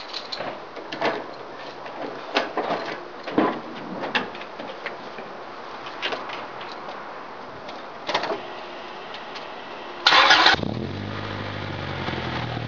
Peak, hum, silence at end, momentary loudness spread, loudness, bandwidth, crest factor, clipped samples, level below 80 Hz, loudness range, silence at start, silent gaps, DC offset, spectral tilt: 0 dBFS; none; 0 s; 18 LU; -24 LUFS; 7.4 kHz; 26 dB; under 0.1%; -56 dBFS; 12 LU; 0 s; none; 0.4%; -1 dB/octave